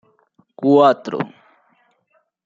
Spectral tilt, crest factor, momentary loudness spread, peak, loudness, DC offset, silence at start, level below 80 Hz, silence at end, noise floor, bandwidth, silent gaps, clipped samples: -7.5 dB/octave; 18 dB; 14 LU; -2 dBFS; -17 LUFS; under 0.1%; 0.6 s; -70 dBFS; 1.2 s; -65 dBFS; 7.6 kHz; none; under 0.1%